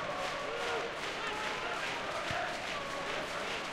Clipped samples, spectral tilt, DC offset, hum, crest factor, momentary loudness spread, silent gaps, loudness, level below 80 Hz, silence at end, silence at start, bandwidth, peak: under 0.1%; -2.5 dB/octave; under 0.1%; none; 16 dB; 2 LU; none; -36 LUFS; -62 dBFS; 0 s; 0 s; 16 kHz; -22 dBFS